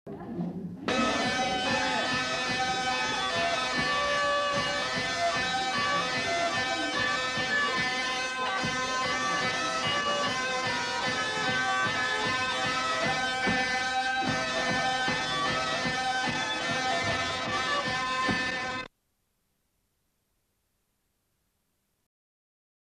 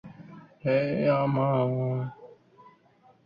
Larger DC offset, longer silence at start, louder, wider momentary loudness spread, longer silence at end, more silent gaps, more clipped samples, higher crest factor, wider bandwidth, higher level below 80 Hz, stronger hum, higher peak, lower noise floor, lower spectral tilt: neither; about the same, 0.05 s vs 0.05 s; about the same, -28 LUFS vs -27 LUFS; second, 3 LU vs 15 LU; first, 4 s vs 1 s; neither; neither; about the same, 16 dB vs 18 dB; first, 13 kHz vs 5.2 kHz; first, -58 dBFS vs -66 dBFS; neither; about the same, -14 dBFS vs -12 dBFS; first, -77 dBFS vs -61 dBFS; second, -2.5 dB/octave vs -10.5 dB/octave